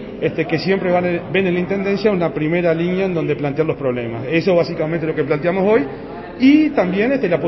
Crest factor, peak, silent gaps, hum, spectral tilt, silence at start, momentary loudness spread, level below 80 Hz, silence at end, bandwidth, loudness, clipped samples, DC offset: 16 dB; -2 dBFS; none; none; -8.5 dB/octave; 0 s; 6 LU; -46 dBFS; 0 s; 6 kHz; -17 LUFS; under 0.1%; under 0.1%